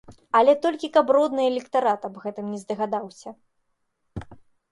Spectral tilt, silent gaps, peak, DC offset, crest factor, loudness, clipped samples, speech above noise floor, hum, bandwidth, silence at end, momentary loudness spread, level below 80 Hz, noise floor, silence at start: -5.5 dB/octave; none; -6 dBFS; under 0.1%; 20 dB; -23 LUFS; under 0.1%; 50 dB; none; 11.5 kHz; 0.35 s; 21 LU; -56 dBFS; -73 dBFS; 0.1 s